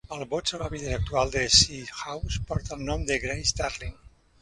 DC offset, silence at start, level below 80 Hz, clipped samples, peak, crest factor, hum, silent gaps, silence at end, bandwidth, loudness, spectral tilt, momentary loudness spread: under 0.1%; 0.1 s; -38 dBFS; under 0.1%; -4 dBFS; 24 dB; none; none; 0.35 s; 11.5 kHz; -26 LUFS; -2.5 dB/octave; 16 LU